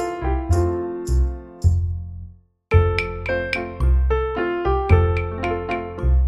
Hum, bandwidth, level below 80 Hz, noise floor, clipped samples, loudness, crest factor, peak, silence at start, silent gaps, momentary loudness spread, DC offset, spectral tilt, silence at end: none; 11.5 kHz; -24 dBFS; -42 dBFS; under 0.1%; -22 LUFS; 18 dB; -2 dBFS; 0 s; none; 9 LU; under 0.1%; -7.5 dB/octave; 0 s